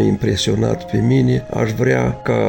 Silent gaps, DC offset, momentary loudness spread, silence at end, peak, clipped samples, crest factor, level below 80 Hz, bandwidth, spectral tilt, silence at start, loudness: none; under 0.1%; 4 LU; 0 s; -4 dBFS; under 0.1%; 12 dB; -38 dBFS; 17 kHz; -6.5 dB/octave; 0 s; -17 LUFS